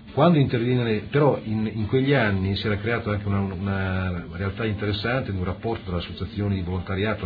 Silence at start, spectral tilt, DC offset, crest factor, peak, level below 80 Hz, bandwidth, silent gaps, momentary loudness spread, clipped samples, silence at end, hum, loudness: 0 s; -10 dB/octave; under 0.1%; 18 dB; -6 dBFS; -46 dBFS; 5 kHz; none; 9 LU; under 0.1%; 0 s; none; -24 LUFS